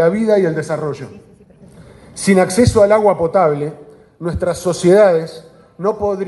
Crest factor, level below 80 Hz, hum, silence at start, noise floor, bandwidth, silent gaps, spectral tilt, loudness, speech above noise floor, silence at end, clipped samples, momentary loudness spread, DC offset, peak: 16 dB; -38 dBFS; none; 0 s; -43 dBFS; 12 kHz; none; -6 dB/octave; -14 LUFS; 29 dB; 0 s; under 0.1%; 16 LU; under 0.1%; 0 dBFS